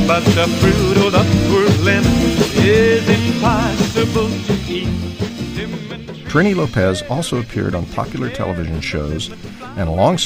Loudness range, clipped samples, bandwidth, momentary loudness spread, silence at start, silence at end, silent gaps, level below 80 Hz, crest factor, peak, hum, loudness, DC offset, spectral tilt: 7 LU; under 0.1%; 16 kHz; 11 LU; 0 s; 0 s; none; -32 dBFS; 16 dB; 0 dBFS; none; -16 LUFS; under 0.1%; -5.5 dB/octave